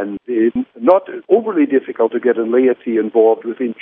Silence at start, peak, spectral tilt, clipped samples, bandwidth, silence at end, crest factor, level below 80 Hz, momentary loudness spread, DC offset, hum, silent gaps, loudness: 0 s; 0 dBFS; -10 dB/octave; under 0.1%; 3.7 kHz; 0.1 s; 16 dB; -62 dBFS; 5 LU; under 0.1%; none; none; -16 LUFS